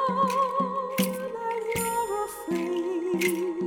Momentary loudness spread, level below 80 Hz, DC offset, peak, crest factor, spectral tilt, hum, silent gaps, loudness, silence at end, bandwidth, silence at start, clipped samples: 6 LU; -60 dBFS; under 0.1%; -10 dBFS; 18 dB; -4.5 dB/octave; none; none; -28 LUFS; 0 s; over 20 kHz; 0 s; under 0.1%